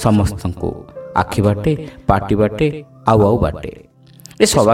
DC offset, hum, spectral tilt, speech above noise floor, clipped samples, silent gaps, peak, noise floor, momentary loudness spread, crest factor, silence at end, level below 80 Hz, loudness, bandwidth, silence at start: under 0.1%; none; -6 dB/octave; 27 dB; under 0.1%; none; 0 dBFS; -42 dBFS; 12 LU; 16 dB; 0 s; -34 dBFS; -17 LUFS; 16.5 kHz; 0 s